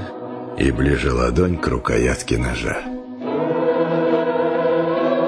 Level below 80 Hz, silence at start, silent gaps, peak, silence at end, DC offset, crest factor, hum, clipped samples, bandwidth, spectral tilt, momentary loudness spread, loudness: -30 dBFS; 0 s; none; -4 dBFS; 0 s; under 0.1%; 16 dB; none; under 0.1%; 11 kHz; -6.5 dB/octave; 9 LU; -20 LUFS